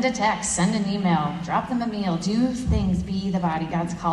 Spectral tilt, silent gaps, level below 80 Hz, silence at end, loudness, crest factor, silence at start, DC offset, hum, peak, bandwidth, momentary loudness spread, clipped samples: -5 dB/octave; none; -38 dBFS; 0 s; -24 LUFS; 14 dB; 0 s; under 0.1%; none; -8 dBFS; 11 kHz; 4 LU; under 0.1%